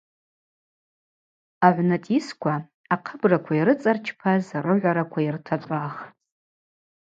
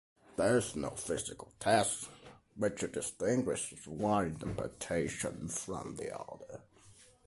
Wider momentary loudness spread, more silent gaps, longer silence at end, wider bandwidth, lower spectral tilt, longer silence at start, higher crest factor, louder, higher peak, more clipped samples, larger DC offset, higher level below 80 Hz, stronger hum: second, 9 LU vs 15 LU; first, 2.74-2.84 s vs none; first, 1.05 s vs 0.25 s; second, 7.8 kHz vs 12 kHz; first, -8 dB/octave vs -4.5 dB/octave; first, 1.6 s vs 0.3 s; about the same, 22 dB vs 20 dB; first, -23 LUFS vs -35 LUFS; first, -2 dBFS vs -16 dBFS; neither; neither; second, -72 dBFS vs -60 dBFS; neither